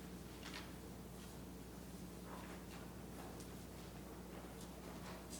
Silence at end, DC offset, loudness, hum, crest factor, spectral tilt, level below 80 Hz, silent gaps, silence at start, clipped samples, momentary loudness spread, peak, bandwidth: 0 s; under 0.1%; -53 LUFS; none; 16 dB; -4.5 dB/octave; -60 dBFS; none; 0 s; under 0.1%; 3 LU; -36 dBFS; over 20 kHz